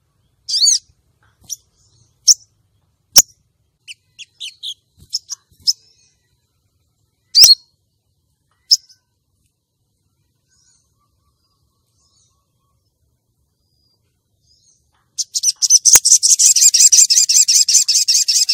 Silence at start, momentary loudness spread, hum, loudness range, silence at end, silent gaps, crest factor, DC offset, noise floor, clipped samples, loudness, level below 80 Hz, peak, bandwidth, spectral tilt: 0.5 s; 23 LU; none; 17 LU; 0 s; none; 18 dB; under 0.1%; -69 dBFS; 0.3%; -10 LUFS; -60 dBFS; 0 dBFS; over 20 kHz; 4 dB/octave